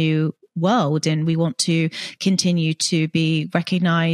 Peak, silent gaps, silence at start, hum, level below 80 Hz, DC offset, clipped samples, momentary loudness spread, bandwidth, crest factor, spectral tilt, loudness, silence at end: -4 dBFS; none; 0 s; none; -66 dBFS; under 0.1%; under 0.1%; 4 LU; 12 kHz; 14 dB; -5 dB/octave; -20 LUFS; 0 s